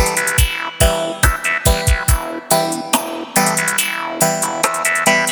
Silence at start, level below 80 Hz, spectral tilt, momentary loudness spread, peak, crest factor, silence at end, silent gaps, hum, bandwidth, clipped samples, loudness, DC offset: 0 s; -24 dBFS; -3 dB/octave; 4 LU; 0 dBFS; 16 dB; 0 s; none; none; over 20 kHz; under 0.1%; -16 LUFS; under 0.1%